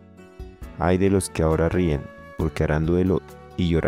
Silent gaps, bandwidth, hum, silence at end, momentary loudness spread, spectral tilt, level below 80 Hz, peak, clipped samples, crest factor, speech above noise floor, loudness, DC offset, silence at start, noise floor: none; 15 kHz; none; 0 s; 19 LU; -7 dB/octave; -38 dBFS; -8 dBFS; under 0.1%; 16 dB; 20 dB; -23 LUFS; under 0.1%; 0.2 s; -41 dBFS